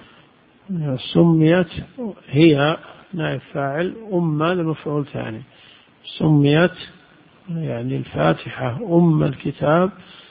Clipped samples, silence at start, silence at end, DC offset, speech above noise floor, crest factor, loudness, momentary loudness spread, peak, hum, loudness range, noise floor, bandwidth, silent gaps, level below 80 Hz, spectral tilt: under 0.1%; 0.7 s; 0.3 s; under 0.1%; 33 dB; 20 dB; -19 LUFS; 16 LU; 0 dBFS; none; 4 LU; -52 dBFS; 5 kHz; none; -50 dBFS; -12.5 dB/octave